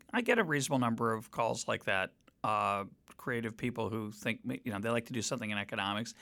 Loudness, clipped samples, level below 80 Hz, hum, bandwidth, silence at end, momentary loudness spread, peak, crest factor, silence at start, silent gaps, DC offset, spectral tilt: -34 LUFS; under 0.1%; -70 dBFS; none; 18 kHz; 0.1 s; 8 LU; -14 dBFS; 20 dB; 0.15 s; none; under 0.1%; -4.5 dB/octave